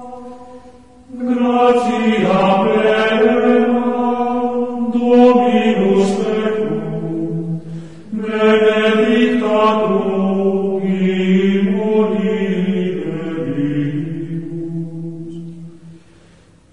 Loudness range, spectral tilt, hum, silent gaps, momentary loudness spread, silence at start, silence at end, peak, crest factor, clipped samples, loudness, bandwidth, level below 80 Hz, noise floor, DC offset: 7 LU; -7 dB/octave; none; none; 14 LU; 0 s; 0 s; 0 dBFS; 14 dB; under 0.1%; -15 LUFS; 10.5 kHz; -54 dBFS; -47 dBFS; 1%